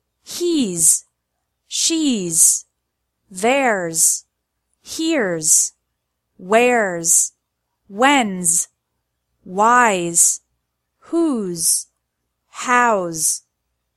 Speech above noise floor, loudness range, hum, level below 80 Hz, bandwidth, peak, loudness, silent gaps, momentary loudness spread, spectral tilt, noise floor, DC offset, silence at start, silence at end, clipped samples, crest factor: 58 dB; 2 LU; 60 Hz at -55 dBFS; -64 dBFS; 15.5 kHz; 0 dBFS; -16 LUFS; none; 11 LU; -2 dB/octave; -75 dBFS; under 0.1%; 0.3 s; 0.6 s; under 0.1%; 20 dB